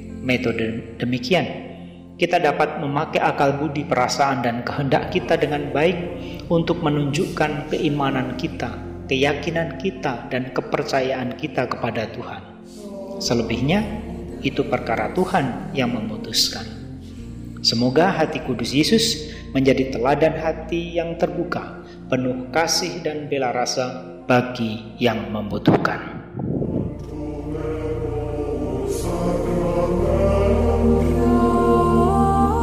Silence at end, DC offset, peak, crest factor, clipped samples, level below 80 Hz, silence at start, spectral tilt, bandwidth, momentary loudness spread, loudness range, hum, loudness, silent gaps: 0 s; under 0.1%; -4 dBFS; 16 dB; under 0.1%; -36 dBFS; 0 s; -5.5 dB/octave; 16 kHz; 12 LU; 5 LU; none; -21 LUFS; none